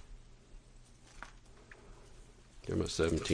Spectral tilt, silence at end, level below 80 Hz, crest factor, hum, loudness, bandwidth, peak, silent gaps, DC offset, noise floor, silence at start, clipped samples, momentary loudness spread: -5 dB/octave; 0 s; -52 dBFS; 22 dB; none; -36 LUFS; 10.5 kHz; -18 dBFS; none; under 0.1%; -58 dBFS; 0 s; under 0.1%; 28 LU